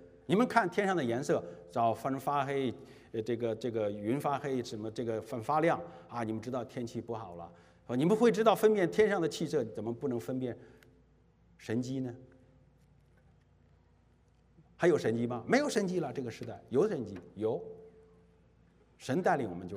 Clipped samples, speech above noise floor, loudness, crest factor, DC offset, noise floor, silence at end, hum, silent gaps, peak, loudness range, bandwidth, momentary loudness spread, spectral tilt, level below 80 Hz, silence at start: under 0.1%; 34 dB; -33 LUFS; 24 dB; under 0.1%; -66 dBFS; 0 s; none; none; -10 dBFS; 11 LU; 15.5 kHz; 14 LU; -6 dB/octave; -70 dBFS; 0 s